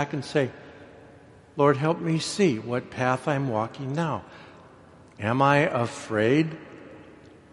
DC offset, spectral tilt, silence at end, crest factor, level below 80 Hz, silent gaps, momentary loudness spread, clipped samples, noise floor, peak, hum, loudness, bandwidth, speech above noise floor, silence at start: under 0.1%; -6 dB/octave; 0.4 s; 22 dB; -64 dBFS; none; 21 LU; under 0.1%; -51 dBFS; -6 dBFS; none; -25 LUFS; 11.5 kHz; 26 dB; 0 s